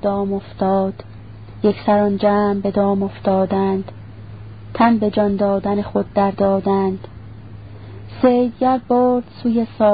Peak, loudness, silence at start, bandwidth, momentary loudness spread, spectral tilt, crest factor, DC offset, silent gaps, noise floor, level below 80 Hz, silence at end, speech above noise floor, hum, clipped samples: 0 dBFS; -18 LUFS; 0.05 s; 5 kHz; 21 LU; -12.5 dB/octave; 18 dB; 0.5%; none; -36 dBFS; -46 dBFS; 0 s; 19 dB; none; under 0.1%